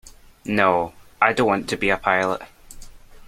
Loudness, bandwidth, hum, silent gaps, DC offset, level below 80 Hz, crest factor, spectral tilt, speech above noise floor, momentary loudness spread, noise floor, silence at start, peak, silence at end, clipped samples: -21 LUFS; 16 kHz; none; none; under 0.1%; -48 dBFS; 22 dB; -5 dB/octave; 20 dB; 11 LU; -40 dBFS; 0.45 s; 0 dBFS; 0.3 s; under 0.1%